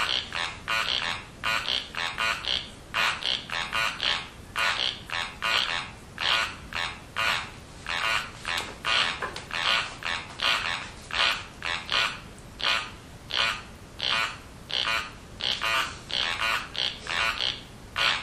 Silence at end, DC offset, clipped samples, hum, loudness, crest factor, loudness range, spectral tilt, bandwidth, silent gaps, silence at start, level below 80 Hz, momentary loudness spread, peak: 0 s; under 0.1%; under 0.1%; none; -27 LUFS; 22 dB; 1 LU; -1 dB/octave; 15 kHz; none; 0 s; -50 dBFS; 8 LU; -8 dBFS